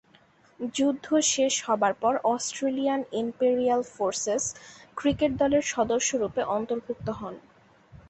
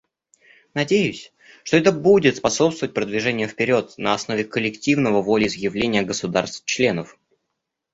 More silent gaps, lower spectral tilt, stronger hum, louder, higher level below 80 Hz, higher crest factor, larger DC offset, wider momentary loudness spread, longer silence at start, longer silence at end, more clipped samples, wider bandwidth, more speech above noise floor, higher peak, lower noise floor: neither; second, -3 dB/octave vs -4.5 dB/octave; neither; second, -26 LUFS vs -20 LUFS; about the same, -58 dBFS vs -56 dBFS; about the same, 16 dB vs 20 dB; neither; about the same, 10 LU vs 9 LU; second, 0.6 s vs 0.75 s; second, 0.1 s vs 0.9 s; neither; about the same, 8.6 kHz vs 8 kHz; second, 33 dB vs 59 dB; second, -10 dBFS vs -2 dBFS; second, -60 dBFS vs -79 dBFS